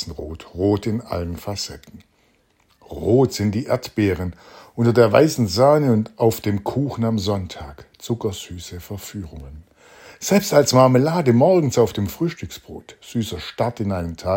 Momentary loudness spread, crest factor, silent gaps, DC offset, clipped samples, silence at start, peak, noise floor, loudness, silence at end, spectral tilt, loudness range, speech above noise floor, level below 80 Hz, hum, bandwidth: 19 LU; 20 dB; none; under 0.1%; under 0.1%; 0 s; 0 dBFS; -61 dBFS; -19 LUFS; 0 s; -6 dB/octave; 8 LU; 41 dB; -48 dBFS; none; 16.5 kHz